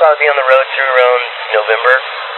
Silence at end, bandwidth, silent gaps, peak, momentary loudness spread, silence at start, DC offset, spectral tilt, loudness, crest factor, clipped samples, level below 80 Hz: 0 s; 4.3 kHz; none; 0 dBFS; 6 LU; 0 s; under 0.1%; 0 dB/octave; -11 LUFS; 12 dB; under 0.1%; -82 dBFS